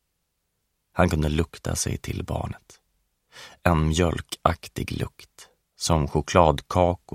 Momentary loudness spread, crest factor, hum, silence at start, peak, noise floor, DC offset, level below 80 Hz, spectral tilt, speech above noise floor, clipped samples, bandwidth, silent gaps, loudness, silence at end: 14 LU; 24 dB; none; 0.95 s; 0 dBFS; -76 dBFS; under 0.1%; -38 dBFS; -5.5 dB/octave; 52 dB; under 0.1%; 16 kHz; none; -25 LUFS; 0.2 s